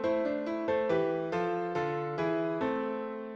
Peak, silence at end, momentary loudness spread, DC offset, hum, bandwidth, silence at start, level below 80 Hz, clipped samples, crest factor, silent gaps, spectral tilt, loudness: -18 dBFS; 0 s; 4 LU; under 0.1%; none; 7.6 kHz; 0 s; -68 dBFS; under 0.1%; 14 dB; none; -7.5 dB/octave; -32 LUFS